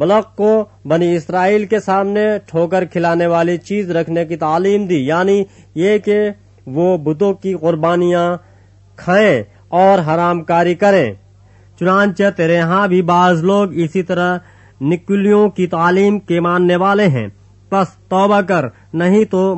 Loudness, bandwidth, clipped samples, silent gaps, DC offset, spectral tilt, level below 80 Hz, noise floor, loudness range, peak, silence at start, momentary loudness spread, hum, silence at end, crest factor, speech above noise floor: -14 LUFS; 8.4 kHz; under 0.1%; none; under 0.1%; -7 dB/octave; -54 dBFS; -45 dBFS; 2 LU; 0 dBFS; 0 s; 7 LU; none; 0 s; 14 dB; 32 dB